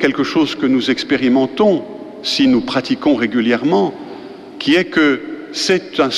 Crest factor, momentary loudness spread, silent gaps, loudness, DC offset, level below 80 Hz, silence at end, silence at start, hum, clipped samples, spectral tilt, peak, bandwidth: 14 dB; 11 LU; none; -16 LUFS; under 0.1%; -52 dBFS; 0 s; 0 s; none; under 0.1%; -4.5 dB/octave; -2 dBFS; 12 kHz